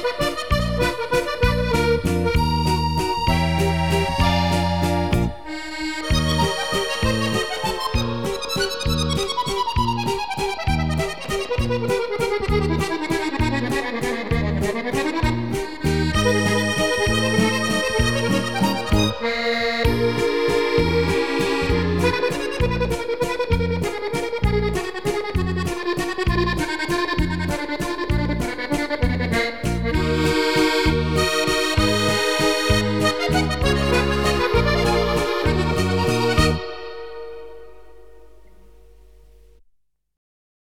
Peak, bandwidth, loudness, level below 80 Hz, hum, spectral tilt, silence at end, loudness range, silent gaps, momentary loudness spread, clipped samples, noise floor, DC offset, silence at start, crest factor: -4 dBFS; 17.5 kHz; -21 LUFS; -30 dBFS; none; -5 dB/octave; 0.6 s; 4 LU; none; 6 LU; under 0.1%; -63 dBFS; 1%; 0 s; 18 dB